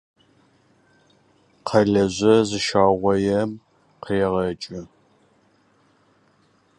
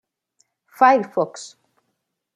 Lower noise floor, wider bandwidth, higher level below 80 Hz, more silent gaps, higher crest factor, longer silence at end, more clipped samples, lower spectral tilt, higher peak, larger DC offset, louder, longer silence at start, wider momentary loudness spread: second, -61 dBFS vs -76 dBFS; second, 10.5 kHz vs 13.5 kHz; first, -52 dBFS vs -80 dBFS; neither; about the same, 20 dB vs 20 dB; first, 1.95 s vs 0.9 s; neither; about the same, -5.5 dB/octave vs -4.5 dB/octave; about the same, -2 dBFS vs -2 dBFS; neither; about the same, -20 LUFS vs -18 LUFS; first, 1.65 s vs 0.8 s; second, 17 LU vs 22 LU